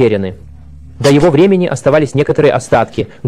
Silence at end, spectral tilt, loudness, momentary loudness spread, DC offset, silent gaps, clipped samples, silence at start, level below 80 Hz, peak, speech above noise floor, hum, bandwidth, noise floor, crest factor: 0 s; -6.5 dB/octave; -11 LUFS; 8 LU; 1%; none; under 0.1%; 0 s; -38 dBFS; 0 dBFS; 24 dB; none; 13.5 kHz; -34 dBFS; 12 dB